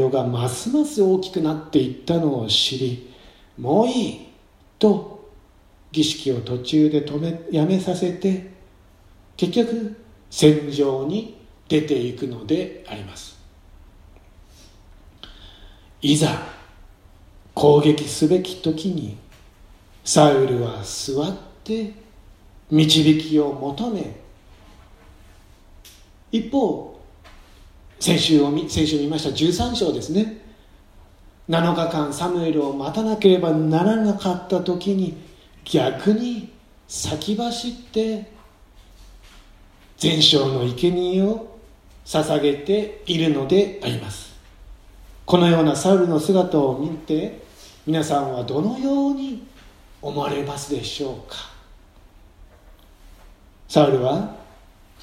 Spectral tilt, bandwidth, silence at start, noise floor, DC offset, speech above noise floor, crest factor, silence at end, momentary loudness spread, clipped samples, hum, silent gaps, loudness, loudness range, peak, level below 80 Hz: -5.5 dB/octave; 15.5 kHz; 0 s; -52 dBFS; under 0.1%; 32 dB; 22 dB; 0.6 s; 16 LU; under 0.1%; none; none; -21 LUFS; 8 LU; 0 dBFS; -48 dBFS